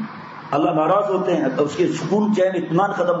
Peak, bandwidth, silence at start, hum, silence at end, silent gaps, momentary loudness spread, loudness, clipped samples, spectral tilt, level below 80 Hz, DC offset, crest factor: -6 dBFS; 8 kHz; 0 s; none; 0 s; none; 4 LU; -19 LUFS; under 0.1%; -6.5 dB/octave; -68 dBFS; under 0.1%; 14 dB